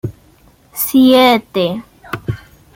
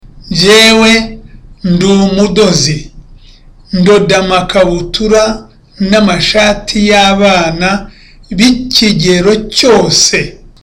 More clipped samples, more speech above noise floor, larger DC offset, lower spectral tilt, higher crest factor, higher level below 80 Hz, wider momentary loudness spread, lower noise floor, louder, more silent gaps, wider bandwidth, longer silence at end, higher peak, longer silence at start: neither; first, 37 dB vs 29 dB; neither; about the same, -5 dB/octave vs -4 dB/octave; first, 14 dB vs 8 dB; second, -46 dBFS vs -28 dBFS; first, 20 LU vs 11 LU; first, -48 dBFS vs -36 dBFS; second, -13 LUFS vs -8 LUFS; neither; about the same, 17 kHz vs 17 kHz; about the same, 0.4 s vs 0.3 s; about the same, -2 dBFS vs 0 dBFS; about the same, 0.05 s vs 0.15 s